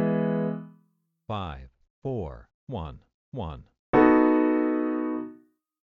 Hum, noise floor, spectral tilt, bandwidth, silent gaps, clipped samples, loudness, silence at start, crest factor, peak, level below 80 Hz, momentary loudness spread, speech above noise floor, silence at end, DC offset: none; -69 dBFS; -10 dB/octave; 4.4 kHz; 1.90-2.02 s, 2.54-2.67 s, 3.14-3.32 s, 3.79-3.93 s; under 0.1%; -25 LUFS; 0 s; 20 dB; -6 dBFS; -50 dBFS; 22 LU; 35 dB; 0.5 s; under 0.1%